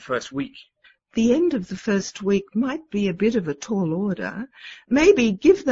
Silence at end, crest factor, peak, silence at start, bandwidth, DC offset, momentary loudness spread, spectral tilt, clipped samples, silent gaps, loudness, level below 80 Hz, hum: 0 s; 18 dB; -4 dBFS; 0 s; 7.8 kHz; under 0.1%; 14 LU; -6 dB/octave; under 0.1%; none; -22 LUFS; -52 dBFS; none